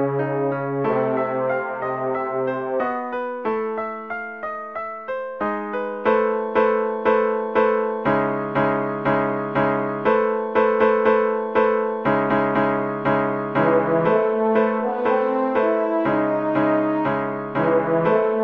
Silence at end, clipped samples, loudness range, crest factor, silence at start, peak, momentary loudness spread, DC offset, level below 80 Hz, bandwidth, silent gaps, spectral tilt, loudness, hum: 0 s; under 0.1%; 6 LU; 16 dB; 0 s; -6 dBFS; 7 LU; under 0.1%; -58 dBFS; 5.6 kHz; none; -9 dB/octave; -21 LUFS; none